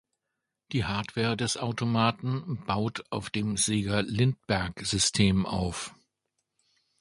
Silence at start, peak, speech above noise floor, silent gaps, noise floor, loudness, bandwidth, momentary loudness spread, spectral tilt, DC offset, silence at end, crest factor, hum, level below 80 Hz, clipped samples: 0.7 s; -8 dBFS; 57 dB; none; -85 dBFS; -28 LUFS; 11.5 kHz; 8 LU; -4.5 dB/octave; under 0.1%; 1.1 s; 22 dB; none; -50 dBFS; under 0.1%